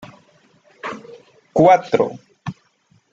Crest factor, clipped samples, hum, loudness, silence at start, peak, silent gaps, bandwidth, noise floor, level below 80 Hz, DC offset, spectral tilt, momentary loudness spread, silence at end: 20 dB; under 0.1%; none; -16 LUFS; 0.85 s; -2 dBFS; none; 7.6 kHz; -59 dBFS; -60 dBFS; under 0.1%; -7 dB/octave; 21 LU; 0.6 s